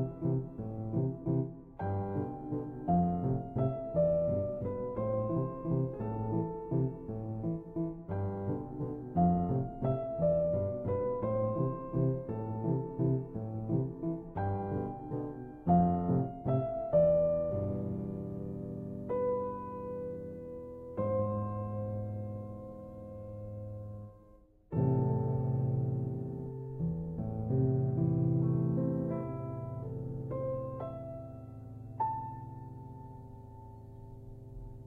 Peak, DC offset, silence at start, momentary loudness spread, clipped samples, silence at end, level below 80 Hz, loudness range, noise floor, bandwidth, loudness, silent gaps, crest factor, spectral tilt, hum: -16 dBFS; under 0.1%; 0 s; 16 LU; under 0.1%; 0 s; -54 dBFS; 8 LU; -60 dBFS; 2.8 kHz; -34 LUFS; none; 18 dB; -13 dB/octave; none